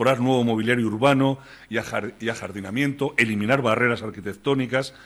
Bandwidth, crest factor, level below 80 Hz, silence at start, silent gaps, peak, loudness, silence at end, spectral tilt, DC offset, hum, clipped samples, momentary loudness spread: 13.5 kHz; 18 dB; -60 dBFS; 0 s; none; -6 dBFS; -23 LUFS; 0.05 s; -6 dB/octave; under 0.1%; none; under 0.1%; 10 LU